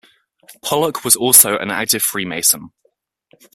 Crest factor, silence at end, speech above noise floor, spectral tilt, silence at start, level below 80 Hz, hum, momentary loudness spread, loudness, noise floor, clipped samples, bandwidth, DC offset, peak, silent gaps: 18 dB; 0.85 s; 48 dB; -1.5 dB/octave; 0.5 s; -60 dBFS; none; 12 LU; -13 LUFS; -64 dBFS; 0.2%; 16 kHz; under 0.1%; 0 dBFS; none